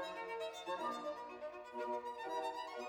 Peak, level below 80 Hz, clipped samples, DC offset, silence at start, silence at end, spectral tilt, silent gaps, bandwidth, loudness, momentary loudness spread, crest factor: -30 dBFS; -80 dBFS; under 0.1%; under 0.1%; 0 s; 0 s; -3 dB/octave; none; 19.5 kHz; -44 LUFS; 6 LU; 14 dB